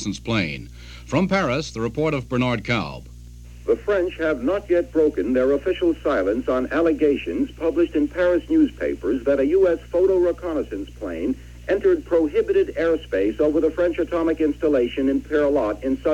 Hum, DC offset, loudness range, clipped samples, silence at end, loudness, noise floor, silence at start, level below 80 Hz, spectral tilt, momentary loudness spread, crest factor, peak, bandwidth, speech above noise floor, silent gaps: none; under 0.1%; 3 LU; under 0.1%; 0 s; -21 LUFS; -40 dBFS; 0 s; -42 dBFS; -6.5 dB/octave; 8 LU; 16 dB; -6 dBFS; 11 kHz; 19 dB; none